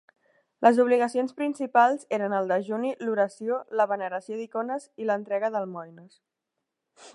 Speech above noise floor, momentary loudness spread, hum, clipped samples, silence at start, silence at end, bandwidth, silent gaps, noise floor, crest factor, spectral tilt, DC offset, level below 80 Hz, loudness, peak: 58 dB; 11 LU; none; under 0.1%; 0.6 s; 0.05 s; 11 kHz; none; -84 dBFS; 22 dB; -6 dB/octave; under 0.1%; -84 dBFS; -26 LUFS; -4 dBFS